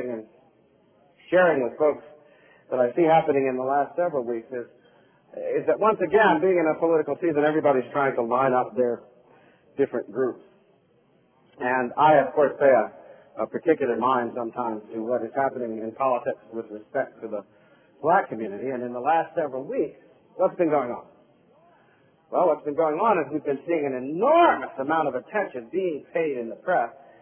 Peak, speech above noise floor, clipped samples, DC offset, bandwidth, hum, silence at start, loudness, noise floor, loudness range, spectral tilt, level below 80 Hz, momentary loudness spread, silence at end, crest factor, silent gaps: -6 dBFS; 39 dB; under 0.1%; under 0.1%; 3.5 kHz; none; 0 s; -24 LUFS; -62 dBFS; 6 LU; -10 dB/octave; -68 dBFS; 13 LU; 0.3 s; 18 dB; none